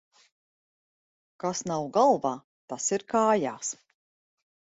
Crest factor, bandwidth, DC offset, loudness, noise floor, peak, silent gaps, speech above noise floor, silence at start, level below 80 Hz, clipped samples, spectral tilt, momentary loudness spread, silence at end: 20 dB; 8.2 kHz; under 0.1%; -27 LUFS; under -90 dBFS; -10 dBFS; 2.44-2.68 s; over 64 dB; 1.45 s; -72 dBFS; under 0.1%; -4 dB/octave; 14 LU; 0.95 s